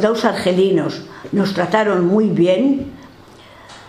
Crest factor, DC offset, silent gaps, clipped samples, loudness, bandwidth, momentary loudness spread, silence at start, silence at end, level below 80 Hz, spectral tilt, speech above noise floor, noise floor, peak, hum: 16 dB; under 0.1%; none; under 0.1%; -16 LUFS; 14 kHz; 9 LU; 0 s; 0 s; -54 dBFS; -6.5 dB/octave; 26 dB; -42 dBFS; -2 dBFS; none